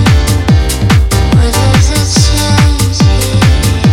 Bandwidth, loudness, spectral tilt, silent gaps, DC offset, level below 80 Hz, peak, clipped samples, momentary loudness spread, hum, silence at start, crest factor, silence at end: 16.5 kHz; -9 LUFS; -5 dB/octave; none; under 0.1%; -14 dBFS; 0 dBFS; under 0.1%; 1 LU; none; 0 s; 8 dB; 0 s